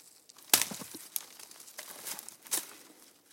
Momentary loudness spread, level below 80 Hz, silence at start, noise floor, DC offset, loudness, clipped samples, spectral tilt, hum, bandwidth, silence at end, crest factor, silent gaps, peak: 22 LU; -86 dBFS; 0.05 s; -58 dBFS; under 0.1%; -32 LUFS; under 0.1%; 0.5 dB/octave; none; 17 kHz; 0.25 s; 32 dB; none; -6 dBFS